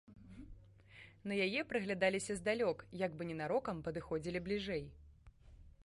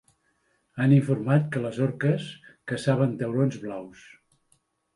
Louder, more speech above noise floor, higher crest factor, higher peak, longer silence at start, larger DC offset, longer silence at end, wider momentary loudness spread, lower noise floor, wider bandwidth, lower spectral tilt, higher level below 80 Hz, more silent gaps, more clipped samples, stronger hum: second, -39 LUFS vs -25 LUFS; second, 22 dB vs 45 dB; about the same, 20 dB vs 18 dB; second, -22 dBFS vs -8 dBFS; second, 0.1 s vs 0.75 s; neither; second, 0 s vs 1.05 s; first, 22 LU vs 19 LU; second, -61 dBFS vs -70 dBFS; about the same, 11.5 kHz vs 11 kHz; second, -5 dB/octave vs -8 dB/octave; about the same, -62 dBFS vs -66 dBFS; neither; neither; neither